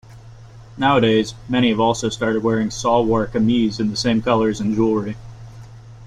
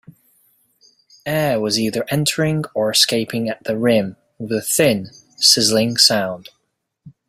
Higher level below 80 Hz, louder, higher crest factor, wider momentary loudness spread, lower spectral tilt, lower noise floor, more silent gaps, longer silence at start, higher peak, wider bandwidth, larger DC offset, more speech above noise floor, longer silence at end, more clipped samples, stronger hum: first, -44 dBFS vs -56 dBFS; about the same, -18 LUFS vs -17 LUFS; about the same, 16 dB vs 20 dB; second, 8 LU vs 13 LU; first, -5.5 dB/octave vs -3 dB/octave; second, -40 dBFS vs -72 dBFS; neither; second, 0.1 s vs 1.25 s; second, -4 dBFS vs 0 dBFS; second, 10.5 kHz vs 16 kHz; neither; second, 23 dB vs 54 dB; second, 0 s vs 0.2 s; neither; neither